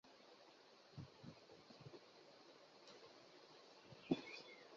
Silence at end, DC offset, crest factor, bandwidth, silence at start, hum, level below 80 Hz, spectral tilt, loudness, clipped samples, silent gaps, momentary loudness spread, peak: 0 s; under 0.1%; 30 dB; 7.2 kHz; 0.05 s; none; -84 dBFS; -4.5 dB/octave; -56 LUFS; under 0.1%; none; 19 LU; -26 dBFS